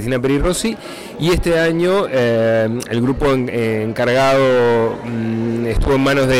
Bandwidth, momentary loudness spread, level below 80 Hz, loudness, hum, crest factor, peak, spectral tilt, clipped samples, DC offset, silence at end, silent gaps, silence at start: 16.5 kHz; 7 LU; -30 dBFS; -16 LUFS; none; 6 dB; -8 dBFS; -5.5 dB/octave; under 0.1%; under 0.1%; 0 s; none; 0 s